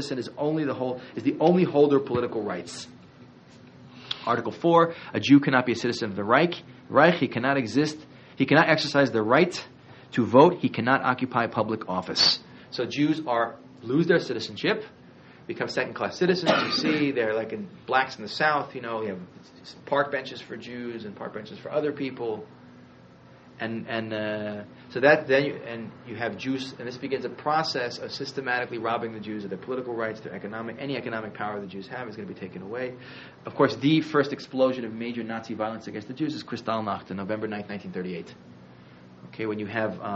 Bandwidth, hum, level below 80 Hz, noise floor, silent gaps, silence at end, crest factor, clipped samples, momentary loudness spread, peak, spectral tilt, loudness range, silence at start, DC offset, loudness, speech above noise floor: 8 kHz; none; -68 dBFS; -51 dBFS; none; 0 s; 22 dB; under 0.1%; 17 LU; -4 dBFS; -3.5 dB/octave; 11 LU; 0 s; under 0.1%; -26 LUFS; 25 dB